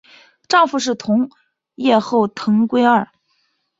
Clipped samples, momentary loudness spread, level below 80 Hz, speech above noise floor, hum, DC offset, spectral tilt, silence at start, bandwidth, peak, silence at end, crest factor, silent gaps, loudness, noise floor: under 0.1%; 7 LU; -62 dBFS; 50 dB; none; under 0.1%; -5 dB/octave; 0.5 s; 7.8 kHz; -2 dBFS; 0.75 s; 16 dB; none; -17 LUFS; -66 dBFS